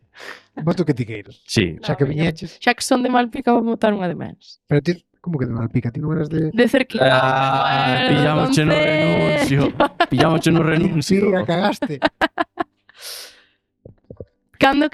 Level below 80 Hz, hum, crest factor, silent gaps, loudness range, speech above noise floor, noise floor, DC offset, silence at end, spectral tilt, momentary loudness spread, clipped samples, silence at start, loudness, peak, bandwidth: -48 dBFS; none; 18 dB; none; 5 LU; 40 dB; -57 dBFS; under 0.1%; 0.05 s; -6 dB/octave; 13 LU; under 0.1%; 0.2 s; -18 LUFS; 0 dBFS; 14 kHz